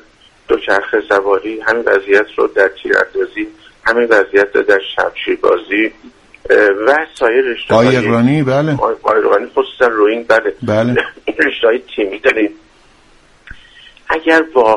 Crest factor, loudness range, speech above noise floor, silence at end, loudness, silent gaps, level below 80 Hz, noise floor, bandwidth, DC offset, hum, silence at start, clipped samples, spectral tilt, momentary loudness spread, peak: 14 dB; 4 LU; 34 dB; 0 s; -13 LUFS; none; -48 dBFS; -47 dBFS; 11 kHz; under 0.1%; none; 0.5 s; under 0.1%; -6 dB/octave; 7 LU; 0 dBFS